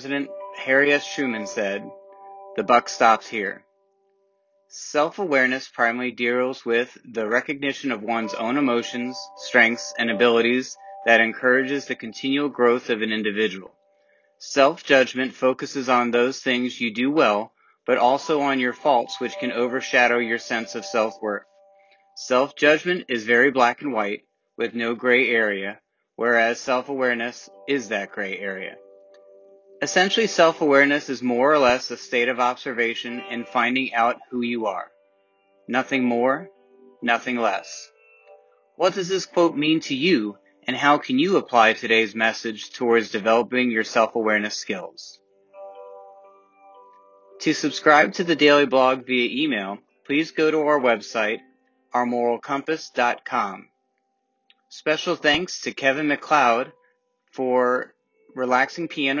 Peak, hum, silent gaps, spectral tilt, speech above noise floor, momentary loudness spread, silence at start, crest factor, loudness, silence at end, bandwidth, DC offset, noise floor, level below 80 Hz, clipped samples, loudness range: -2 dBFS; none; none; -3.5 dB/octave; 52 dB; 13 LU; 0 s; 22 dB; -21 LUFS; 0 s; 7.6 kHz; under 0.1%; -73 dBFS; -68 dBFS; under 0.1%; 5 LU